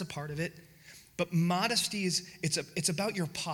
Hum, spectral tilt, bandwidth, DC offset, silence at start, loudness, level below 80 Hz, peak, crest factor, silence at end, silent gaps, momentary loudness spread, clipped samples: none; -3.5 dB/octave; 18.5 kHz; under 0.1%; 0 s; -32 LUFS; -66 dBFS; -14 dBFS; 18 dB; 0 s; none; 10 LU; under 0.1%